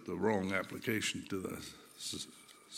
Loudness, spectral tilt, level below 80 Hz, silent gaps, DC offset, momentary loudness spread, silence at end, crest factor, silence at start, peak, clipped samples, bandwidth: -38 LUFS; -4 dB/octave; -72 dBFS; none; under 0.1%; 14 LU; 0 s; 20 dB; 0 s; -18 dBFS; under 0.1%; 17 kHz